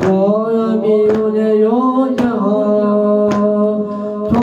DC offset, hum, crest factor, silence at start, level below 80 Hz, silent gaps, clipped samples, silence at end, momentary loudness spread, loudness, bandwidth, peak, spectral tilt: under 0.1%; none; 10 dB; 0 s; -50 dBFS; none; under 0.1%; 0 s; 4 LU; -14 LUFS; 7.6 kHz; -2 dBFS; -8.5 dB/octave